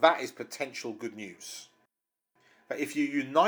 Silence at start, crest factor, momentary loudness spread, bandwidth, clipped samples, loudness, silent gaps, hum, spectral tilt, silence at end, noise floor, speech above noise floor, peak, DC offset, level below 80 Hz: 0 s; 24 dB; 15 LU; over 20 kHz; under 0.1%; -33 LUFS; none; none; -3.5 dB/octave; 0 s; -85 dBFS; 55 dB; -8 dBFS; under 0.1%; -88 dBFS